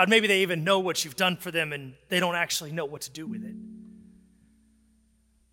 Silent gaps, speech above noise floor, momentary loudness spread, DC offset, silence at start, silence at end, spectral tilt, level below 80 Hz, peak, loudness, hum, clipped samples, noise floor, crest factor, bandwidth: none; 39 dB; 16 LU; under 0.1%; 0 s; 1.65 s; -3 dB/octave; -68 dBFS; -6 dBFS; -26 LUFS; none; under 0.1%; -65 dBFS; 24 dB; 17 kHz